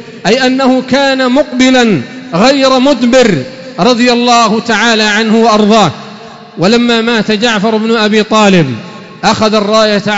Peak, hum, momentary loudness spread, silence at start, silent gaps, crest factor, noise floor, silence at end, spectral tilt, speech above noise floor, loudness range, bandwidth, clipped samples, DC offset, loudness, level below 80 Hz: 0 dBFS; none; 8 LU; 0 s; none; 8 dB; -29 dBFS; 0 s; -4.5 dB/octave; 21 dB; 1 LU; 8 kHz; under 0.1%; 0.4%; -8 LUFS; -44 dBFS